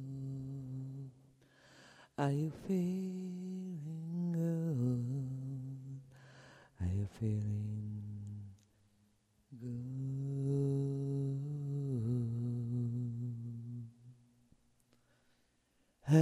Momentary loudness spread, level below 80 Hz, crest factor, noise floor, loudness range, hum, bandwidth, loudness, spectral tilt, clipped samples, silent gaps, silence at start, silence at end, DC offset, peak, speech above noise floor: 15 LU; -68 dBFS; 22 dB; -76 dBFS; 5 LU; none; 11.5 kHz; -39 LUFS; -9 dB/octave; under 0.1%; none; 0 s; 0 s; under 0.1%; -18 dBFS; 40 dB